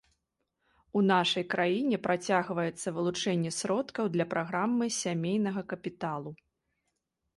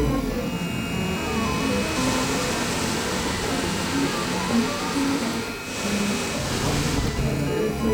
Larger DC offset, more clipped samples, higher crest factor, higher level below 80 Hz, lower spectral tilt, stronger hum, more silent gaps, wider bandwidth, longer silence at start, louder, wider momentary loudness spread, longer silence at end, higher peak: neither; neither; about the same, 18 dB vs 14 dB; second, -72 dBFS vs -36 dBFS; about the same, -4.5 dB/octave vs -4.5 dB/octave; neither; neither; second, 11.5 kHz vs over 20 kHz; first, 0.95 s vs 0 s; second, -30 LUFS vs -24 LUFS; first, 10 LU vs 4 LU; first, 1 s vs 0 s; second, -14 dBFS vs -10 dBFS